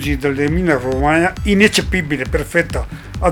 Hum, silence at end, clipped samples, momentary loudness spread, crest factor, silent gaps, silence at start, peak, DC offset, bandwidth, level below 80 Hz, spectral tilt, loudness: none; 0 s; under 0.1%; 8 LU; 16 dB; none; 0 s; 0 dBFS; under 0.1%; over 20 kHz; -26 dBFS; -5 dB/octave; -16 LUFS